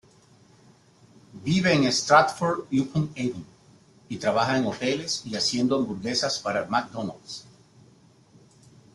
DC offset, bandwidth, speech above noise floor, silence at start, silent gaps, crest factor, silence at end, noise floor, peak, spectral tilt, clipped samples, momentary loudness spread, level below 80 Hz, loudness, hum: under 0.1%; 12 kHz; 32 dB; 1.35 s; none; 22 dB; 1.55 s; -56 dBFS; -4 dBFS; -4.5 dB/octave; under 0.1%; 16 LU; -62 dBFS; -25 LUFS; none